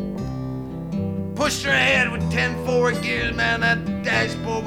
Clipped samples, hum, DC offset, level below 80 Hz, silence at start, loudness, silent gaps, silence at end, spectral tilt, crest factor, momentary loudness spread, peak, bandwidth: under 0.1%; none; 0.3%; -40 dBFS; 0 s; -21 LUFS; none; 0 s; -4.5 dB/octave; 16 dB; 11 LU; -6 dBFS; 16.5 kHz